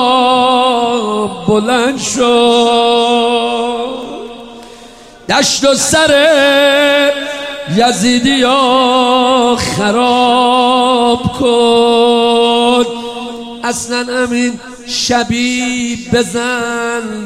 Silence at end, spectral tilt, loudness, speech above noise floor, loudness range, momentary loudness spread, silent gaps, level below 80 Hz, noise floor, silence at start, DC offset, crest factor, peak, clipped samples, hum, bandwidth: 0 s; -3 dB/octave; -11 LUFS; 25 dB; 5 LU; 10 LU; none; -42 dBFS; -36 dBFS; 0 s; under 0.1%; 12 dB; 0 dBFS; under 0.1%; none; 14.5 kHz